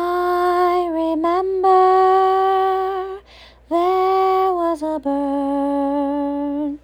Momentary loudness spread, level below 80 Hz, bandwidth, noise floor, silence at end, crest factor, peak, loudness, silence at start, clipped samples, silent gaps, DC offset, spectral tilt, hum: 9 LU; -50 dBFS; 15 kHz; -45 dBFS; 0.05 s; 12 dB; -4 dBFS; -18 LUFS; 0 s; under 0.1%; none; under 0.1%; -5.5 dB/octave; 60 Hz at -65 dBFS